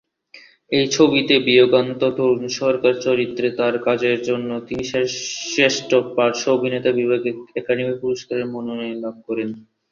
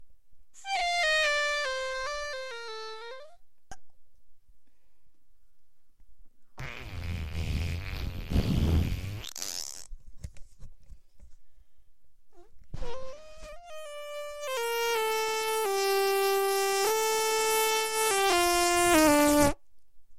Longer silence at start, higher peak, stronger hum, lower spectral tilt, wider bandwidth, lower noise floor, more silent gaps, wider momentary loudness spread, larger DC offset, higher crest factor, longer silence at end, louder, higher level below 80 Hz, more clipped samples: first, 0.35 s vs 0 s; first, -2 dBFS vs -6 dBFS; neither; about the same, -4 dB/octave vs -3.5 dB/octave; second, 7.4 kHz vs 16 kHz; second, -48 dBFS vs -63 dBFS; neither; second, 12 LU vs 21 LU; second, under 0.1% vs 0.5%; second, 18 dB vs 24 dB; first, 0.3 s vs 0.05 s; first, -19 LUFS vs -27 LUFS; second, -60 dBFS vs -42 dBFS; neither